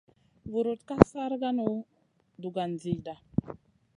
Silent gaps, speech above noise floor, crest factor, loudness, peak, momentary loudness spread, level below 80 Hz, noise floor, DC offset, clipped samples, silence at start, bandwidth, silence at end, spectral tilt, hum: none; 20 dB; 30 dB; -30 LUFS; 0 dBFS; 19 LU; -50 dBFS; -48 dBFS; under 0.1%; under 0.1%; 0.45 s; 10.5 kHz; 0.45 s; -8 dB/octave; none